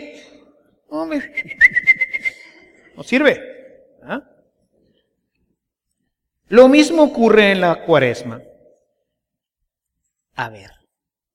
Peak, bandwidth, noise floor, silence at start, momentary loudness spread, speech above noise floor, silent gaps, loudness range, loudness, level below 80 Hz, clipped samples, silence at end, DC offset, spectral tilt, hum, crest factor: 0 dBFS; 12.5 kHz; -81 dBFS; 0 s; 19 LU; 66 dB; none; 9 LU; -14 LUFS; -54 dBFS; under 0.1%; 0.8 s; under 0.1%; -5 dB/octave; none; 18 dB